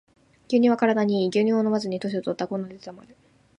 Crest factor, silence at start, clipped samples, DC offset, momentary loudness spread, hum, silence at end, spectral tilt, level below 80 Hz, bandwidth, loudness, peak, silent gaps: 18 dB; 0.5 s; under 0.1%; under 0.1%; 14 LU; none; 0.6 s; -6.5 dB/octave; -70 dBFS; 10 kHz; -23 LUFS; -6 dBFS; none